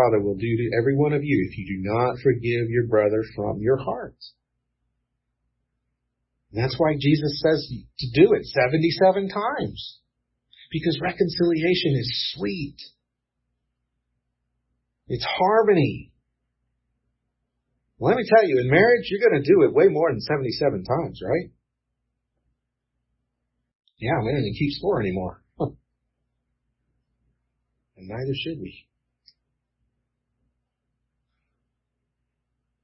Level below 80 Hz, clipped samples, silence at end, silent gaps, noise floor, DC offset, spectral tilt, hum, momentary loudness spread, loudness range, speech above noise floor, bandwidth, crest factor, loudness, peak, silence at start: -54 dBFS; under 0.1%; 4.1 s; 23.75-23.80 s; -80 dBFS; under 0.1%; -10 dB/octave; 60 Hz at -55 dBFS; 15 LU; 17 LU; 58 dB; 6 kHz; 22 dB; -22 LUFS; -2 dBFS; 0 s